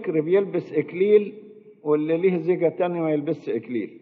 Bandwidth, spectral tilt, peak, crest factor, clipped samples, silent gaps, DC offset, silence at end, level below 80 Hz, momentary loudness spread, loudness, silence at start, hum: 4.6 kHz; -7 dB/octave; -6 dBFS; 16 dB; under 0.1%; none; under 0.1%; 0.05 s; -76 dBFS; 9 LU; -23 LUFS; 0 s; none